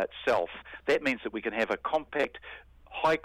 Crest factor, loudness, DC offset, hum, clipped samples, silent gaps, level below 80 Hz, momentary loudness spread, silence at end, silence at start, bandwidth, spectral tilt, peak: 16 dB; -30 LUFS; under 0.1%; none; under 0.1%; none; -60 dBFS; 15 LU; 0.05 s; 0 s; 15.5 kHz; -4.5 dB/octave; -14 dBFS